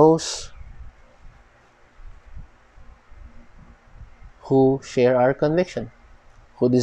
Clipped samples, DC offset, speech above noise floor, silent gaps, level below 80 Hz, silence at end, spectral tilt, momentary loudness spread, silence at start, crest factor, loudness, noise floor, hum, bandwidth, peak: under 0.1%; under 0.1%; 36 dB; none; -46 dBFS; 0 s; -6 dB/octave; 22 LU; 0 s; 22 dB; -21 LUFS; -54 dBFS; none; 10 kHz; -2 dBFS